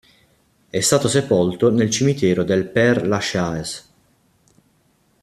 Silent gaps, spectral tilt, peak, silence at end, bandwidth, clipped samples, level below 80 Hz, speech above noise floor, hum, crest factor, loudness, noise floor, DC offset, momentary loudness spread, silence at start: none; -4.5 dB/octave; -2 dBFS; 1.4 s; 14.5 kHz; under 0.1%; -54 dBFS; 43 dB; none; 18 dB; -18 LUFS; -61 dBFS; under 0.1%; 10 LU; 0.75 s